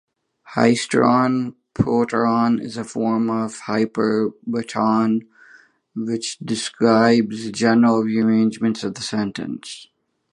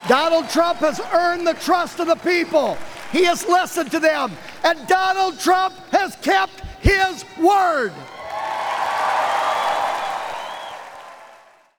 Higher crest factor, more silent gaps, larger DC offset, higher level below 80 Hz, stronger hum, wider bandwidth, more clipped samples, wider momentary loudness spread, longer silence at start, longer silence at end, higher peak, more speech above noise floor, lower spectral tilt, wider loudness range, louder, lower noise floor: about the same, 18 dB vs 18 dB; neither; neither; second, -56 dBFS vs -38 dBFS; neither; second, 10.5 kHz vs 20 kHz; neither; about the same, 12 LU vs 11 LU; first, 0.45 s vs 0 s; about the same, 0.5 s vs 0.5 s; about the same, -2 dBFS vs -2 dBFS; about the same, 32 dB vs 30 dB; first, -5.5 dB/octave vs -4 dB/octave; about the same, 4 LU vs 4 LU; about the same, -20 LUFS vs -19 LUFS; about the same, -51 dBFS vs -49 dBFS